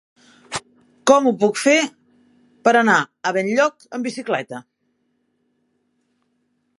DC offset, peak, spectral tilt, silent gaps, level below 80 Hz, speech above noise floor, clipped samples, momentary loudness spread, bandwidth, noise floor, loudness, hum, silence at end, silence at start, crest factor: under 0.1%; 0 dBFS; -3.5 dB/octave; none; -68 dBFS; 51 dB; under 0.1%; 15 LU; 11.5 kHz; -69 dBFS; -19 LUFS; none; 2.2 s; 0.5 s; 22 dB